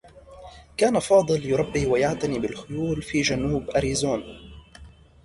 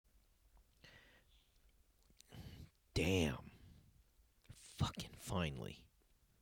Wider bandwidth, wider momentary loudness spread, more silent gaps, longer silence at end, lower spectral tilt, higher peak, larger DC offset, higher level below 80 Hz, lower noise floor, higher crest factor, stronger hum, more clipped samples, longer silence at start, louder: second, 11.5 kHz vs over 20 kHz; second, 11 LU vs 25 LU; neither; second, 0.35 s vs 0.6 s; about the same, -5 dB/octave vs -5 dB/octave; first, -6 dBFS vs -24 dBFS; neither; first, -44 dBFS vs -60 dBFS; second, -48 dBFS vs -74 dBFS; about the same, 18 dB vs 22 dB; neither; neither; second, 0.05 s vs 0.85 s; first, -24 LUFS vs -42 LUFS